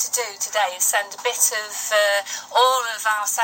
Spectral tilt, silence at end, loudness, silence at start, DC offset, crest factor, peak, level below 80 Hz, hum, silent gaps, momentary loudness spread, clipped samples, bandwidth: 3 dB/octave; 0 s; -20 LUFS; 0 s; under 0.1%; 18 dB; -4 dBFS; -86 dBFS; none; none; 6 LU; under 0.1%; 17 kHz